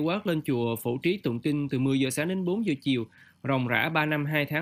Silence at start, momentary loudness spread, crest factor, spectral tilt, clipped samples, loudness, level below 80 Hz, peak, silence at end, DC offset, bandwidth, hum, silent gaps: 0 s; 4 LU; 18 dB; -6 dB/octave; under 0.1%; -27 LUFS; -68 dBFS; -8 dBFS; 0 s; under 0.1%; 15.5 kHz; none; none